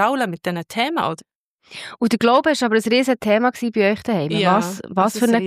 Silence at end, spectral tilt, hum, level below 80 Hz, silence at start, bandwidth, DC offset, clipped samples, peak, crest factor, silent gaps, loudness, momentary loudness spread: 0 s; -5 dB/octave; none; -60 dBFS; 0 s; 15.5 kHz; under 0.1%; under 0.1%; -4 dBFS; 16 dB; 1.35-1.59 s; -19 LUFS; 10 LU